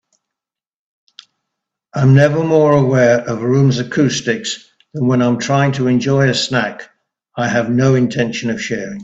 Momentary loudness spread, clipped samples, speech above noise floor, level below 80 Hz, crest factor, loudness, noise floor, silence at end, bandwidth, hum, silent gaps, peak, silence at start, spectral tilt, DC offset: 11 LU; under 0.1%; 75 dB; -52 dBFS; 16 dB; -15 LUFS; -89 dBFS; 0 s; 8 kHz; none; none; 0 dBFS; 1.95 s; -6 dB/octave; under 0.1%